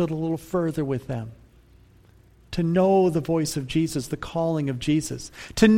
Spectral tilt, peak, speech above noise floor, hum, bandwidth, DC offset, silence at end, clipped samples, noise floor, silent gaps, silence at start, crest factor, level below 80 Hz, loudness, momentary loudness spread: -6 dB/octave; -4 dBFS; 31 dB; none; 16.5 kHz; under 0.1%; 0 s; under 0.1%; -54 dBFS; none; 0 s; 20 dB; -48 dBFS; -25 LUFS; 14 LU